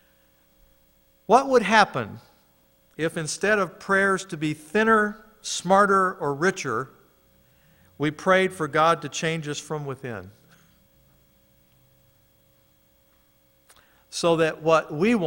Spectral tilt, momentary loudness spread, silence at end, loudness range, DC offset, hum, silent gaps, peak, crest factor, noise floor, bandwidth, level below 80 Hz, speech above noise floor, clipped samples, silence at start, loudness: -4.5 dB/octave; 14 LU; 0 s; 11 LU; under 0.1%; none; none; -2 dBFS; 22 dB; -62 dBFS; 16.5 kHz; -62 dBFS; 39 dB; under 0.1%; 1.3 s; -23 LUFS